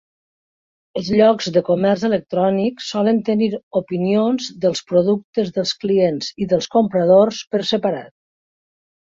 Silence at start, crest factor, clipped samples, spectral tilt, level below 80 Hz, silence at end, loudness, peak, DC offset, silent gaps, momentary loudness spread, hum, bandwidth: 0.95 s; 16 dB; under 0.1%; -6 dB/octave; -58 dBFS; 1.1 s; -18 LUFS; -2 dBFS; under 0.1%; 3.63-3.71 s, 5.24-5.33 s, 7.47-7.51 s; 8 LU; none; 7.8 kHz